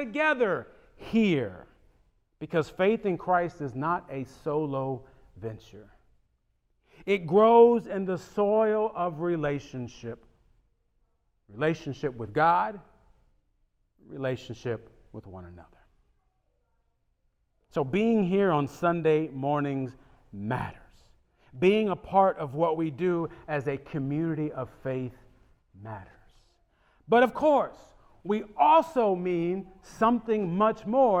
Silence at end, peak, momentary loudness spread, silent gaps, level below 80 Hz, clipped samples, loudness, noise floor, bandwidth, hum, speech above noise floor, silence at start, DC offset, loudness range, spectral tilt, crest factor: 0 s; -8 dBFS; 18 LU; none; -60 dBFS; under 0.1%; -27 LUFS; -72 dBFS; 8.8 kHz; none; 46 dB; 0 s; under 0.1%; 11 LU; -7.5 dB/octave; 20 dB